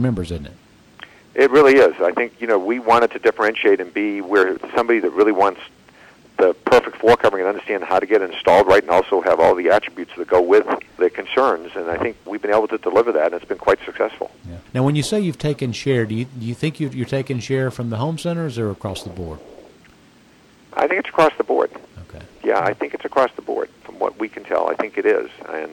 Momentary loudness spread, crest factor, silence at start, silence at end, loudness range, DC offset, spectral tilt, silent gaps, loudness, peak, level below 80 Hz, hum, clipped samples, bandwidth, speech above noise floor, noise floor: 13 LU; 14 dB; 0 s; 0 s; 7 LU; under 0.1%; -6 dB/octave; none; -18 LUFS; -4 dBFS; -50 dBFS; none; under 0.1%; 16.5 kHz; 32 dB; -50 dBFS